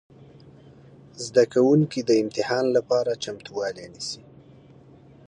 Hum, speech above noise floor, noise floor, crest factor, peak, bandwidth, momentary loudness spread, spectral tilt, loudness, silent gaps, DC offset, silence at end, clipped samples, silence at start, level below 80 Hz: none; 27 dB; -50 dBFS; 18 dB; -6 dBFS; 10.5 kHz; 14 LU; -5.5 dB/octave; -23 LUFS; none; under 0.1%; 1.1 s; under 0.1%; 1.2 s; -66 dBFS